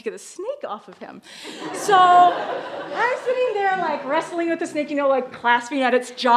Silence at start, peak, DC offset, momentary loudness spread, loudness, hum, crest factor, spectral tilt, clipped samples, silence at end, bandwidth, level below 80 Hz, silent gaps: 0.05 s; -2 dBFS; under 0.1%; 19 LU; -20 LUFS; none; 18 dB; -3 dB/octave; under 0.1%; 0 s; 13 kHz; -76 dBFS; none